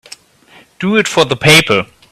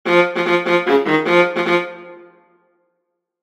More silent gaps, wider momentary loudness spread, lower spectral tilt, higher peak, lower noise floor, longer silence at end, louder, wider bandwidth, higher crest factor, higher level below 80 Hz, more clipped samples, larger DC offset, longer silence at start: neither; first, 9 LU vs 6 LU; second, -3.5 dB/octave vs -5.5 dB/octave; about the same, 0 dBFS vs 0 dBFS; second, -45 dBFS vs -74 dBFS; second, 0.3 s vs 1.25 s; first, -10 LUFS vs -16 LUFS; first, 20 kHz vs 12 kHz; about the same, 14 dB vs 18 dB; first, -46 dBFS vs -68 dBFS; first, 0.2% vs under 0.1%; neither; first, 0.8 s vs 0.05 s